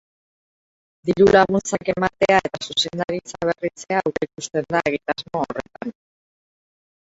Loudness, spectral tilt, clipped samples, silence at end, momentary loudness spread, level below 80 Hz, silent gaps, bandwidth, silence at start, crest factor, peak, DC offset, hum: -21 LUFS; -4.5 dB/octave; under 0.1%; 1.15 s; 13 LU; -52 dBFS; none; 8 kHz; 1.05 s; 22 dB; 0 dBFS; under 0.1%; none